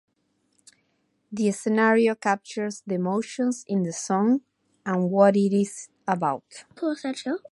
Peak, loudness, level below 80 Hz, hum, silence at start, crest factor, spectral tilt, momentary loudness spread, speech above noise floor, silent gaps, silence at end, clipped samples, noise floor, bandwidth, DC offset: -4 dBFS; -25 LUFS; -76 dBFS; none; 1.3 s; 20 dB; -6 dB/octave; 12 LU; 47 dB; none; 0.15 s; under 0.1%; -71 dBFS; 11.5 kHz; under 0.1%